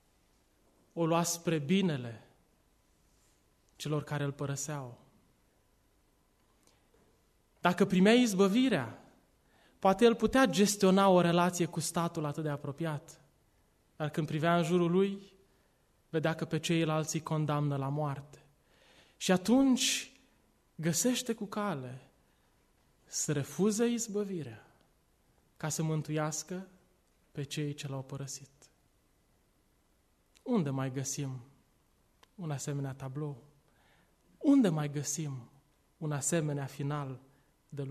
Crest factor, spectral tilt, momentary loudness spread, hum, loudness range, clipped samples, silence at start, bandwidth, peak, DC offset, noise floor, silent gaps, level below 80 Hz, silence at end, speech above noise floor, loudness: 22 dB; -5 dB/octave; 17 LU; none; 12 LU; under 0.1%; 0.95 s; 13.5 kHz; -12 dBFS; under 0.1%; -71 dBFS; none; -68 dBFS; 0 s; 40 dB; -31 LUFS